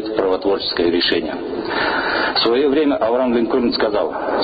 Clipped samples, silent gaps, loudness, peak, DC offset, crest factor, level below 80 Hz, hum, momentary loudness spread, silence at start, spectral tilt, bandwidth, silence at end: under 0.1%; none; -18 LUFS; -6 dBFS; under 0.1%; 12 dB; -48 dBFS; none; 5 LU; 0 s; -1.5 dB/octave; 5 kHz; 0 s